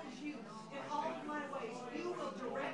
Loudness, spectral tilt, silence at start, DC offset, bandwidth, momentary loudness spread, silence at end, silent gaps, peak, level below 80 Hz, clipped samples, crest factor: -44 LUFS; -5 dB/octave; 0 s; under 0.1%; 11.5 kHz; 6 LU; 0 s; none; -28 dBFS; -80 dBFS; under 0.1%; 16 dB